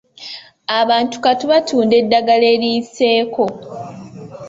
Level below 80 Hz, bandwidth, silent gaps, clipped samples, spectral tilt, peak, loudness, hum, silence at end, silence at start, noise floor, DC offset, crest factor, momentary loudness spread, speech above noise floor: -60 dBFS; 7.8 kHz; none; under 0.1%; -4.5 dB/octave; -2 dBFS; -15 LUFS; none; 0 s; 0.2 s; -35 dBFS; under 0.1%; 14 dB; 18 LU; 20 dB